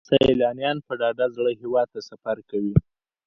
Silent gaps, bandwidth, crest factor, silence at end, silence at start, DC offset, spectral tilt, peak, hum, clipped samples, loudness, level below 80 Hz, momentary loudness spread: none; 7.4 kHz; 20 dB; 0.45 s; 0.1 s; under 0.1%; -7.5 dB/octave; -4 dBFS; none; under 0.1%; -24 LUFS; -44 dBFS; 11 LU